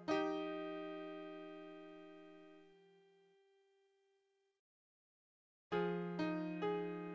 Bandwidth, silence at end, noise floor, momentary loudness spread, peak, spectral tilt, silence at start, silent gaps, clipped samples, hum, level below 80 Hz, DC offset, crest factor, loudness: 7.8 kHz; 0 s; -82 dBFS; 19 LU; -24 dBFS; -7 dB/octave; 0 s; 4.59-5.71 s; under 0.1%; none; -84 dBFS; under 0.1%; 22 dB; -43 LUFS